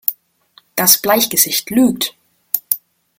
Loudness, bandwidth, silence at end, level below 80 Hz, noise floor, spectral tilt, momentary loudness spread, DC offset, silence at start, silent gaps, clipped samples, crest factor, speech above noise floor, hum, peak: -14 LUFS; over 20 kHz; 0.4 s; -58 dBFS; -52 dBFS; -2 dB/octave; 10 LU; under 0.1%; 0.1 s; none; 0.1%; 18 dB; 38 dB; none; 0 dBFS